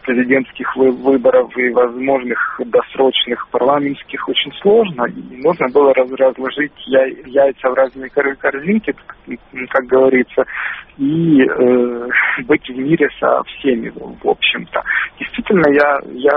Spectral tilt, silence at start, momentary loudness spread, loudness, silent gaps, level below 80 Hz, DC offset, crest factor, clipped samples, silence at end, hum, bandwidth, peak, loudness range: -3 dB/octave; 0.05 s; 10 LU; -15 LUFS; none; -50 dBFS; under 0.1%; 14 dB; under 0.1%; 0 s; none; 5.2 kHz; 0 dBFS; 2 LU